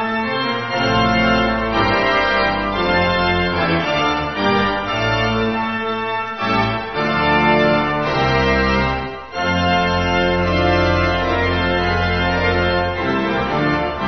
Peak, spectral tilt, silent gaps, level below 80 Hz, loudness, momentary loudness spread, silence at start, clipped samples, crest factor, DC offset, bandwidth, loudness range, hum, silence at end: -2 dBFS; -6 dB/octave; none; -32 dBFS; -17 LUFS; 5 LU; 0 s; under 0.1%; 16 dB; 0.5%; 6.4 kHz; 2 LU; none; 0 s